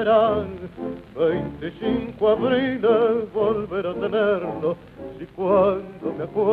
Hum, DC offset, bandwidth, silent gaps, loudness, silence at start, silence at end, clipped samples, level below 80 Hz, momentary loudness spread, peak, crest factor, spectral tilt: none; under 0.1%; 4.7 kHz; none; -22 LUFS; 0 s; 0 s; under 0.1%; -52 dBFS; 14 LU; -6 dBFS; 16 dB; -8.5 dB/octave